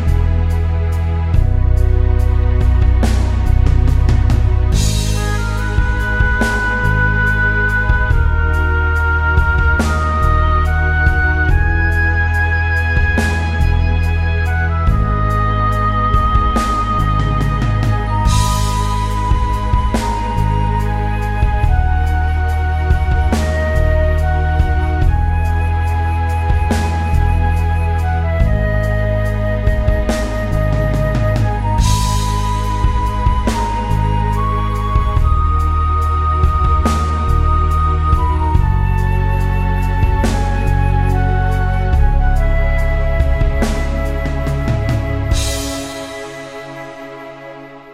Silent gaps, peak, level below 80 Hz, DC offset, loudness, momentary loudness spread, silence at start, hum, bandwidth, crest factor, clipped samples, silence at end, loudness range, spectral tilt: none; 0 dBFS; -16 dBFS; under 0.1%; -16 LUFS; 4 LU; 0 s; none; 14 kHz; 14 dB; under 0.1%; 0 s; 2 LU; -6 dB/octave